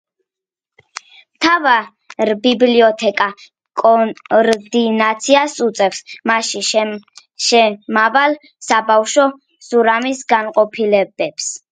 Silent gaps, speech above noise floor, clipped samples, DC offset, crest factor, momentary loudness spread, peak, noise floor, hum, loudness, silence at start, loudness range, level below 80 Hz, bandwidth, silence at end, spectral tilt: none; 72 dB; under 0.1%; under 0.1%; 16 dB; 10 LU; 0 dBFS; -86 dBFS; none; -15 LUFS; 1.4 s; 1 LU; -66 dBFS; 10.5 kHz; 0.15 s; -2.5 dB/octave